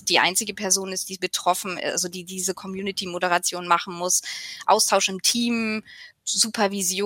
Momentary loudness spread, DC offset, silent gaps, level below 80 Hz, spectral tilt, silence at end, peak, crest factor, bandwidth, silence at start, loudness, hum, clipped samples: 10 LU; under 0.1%; none; -70 dBFS; -1.5 dB/octave; 0 s; -4 dBFS; 20 dB; 16.5 kHz; 0.05 s; -23 LUFS; none; under 0.1%